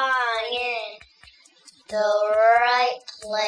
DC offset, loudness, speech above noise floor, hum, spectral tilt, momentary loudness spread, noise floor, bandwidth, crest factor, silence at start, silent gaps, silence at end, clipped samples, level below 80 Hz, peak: under 0.1%; -21 LUFS; 33 dB; none; -1 dB/octave; 14 LU; -53 dBFS; 10.5 kHz; 16 dB; 0 s; none; 0 s; under 0.1%; -66 dBFS; -6 dBFS